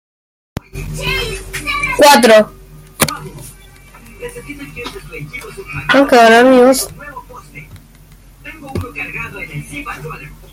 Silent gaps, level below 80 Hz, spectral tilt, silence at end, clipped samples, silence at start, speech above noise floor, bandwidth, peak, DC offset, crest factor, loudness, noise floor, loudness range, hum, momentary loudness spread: none; -36 dBFS; -3.5 dB/octave; 0.2 s; under 0.1%; 0.75 s; 29 dB; 17 kHz; 0 dBFS; under 0.1%; 16 dB; -11 LUFS; -41 dBFS; 13 LU; none; 25 LU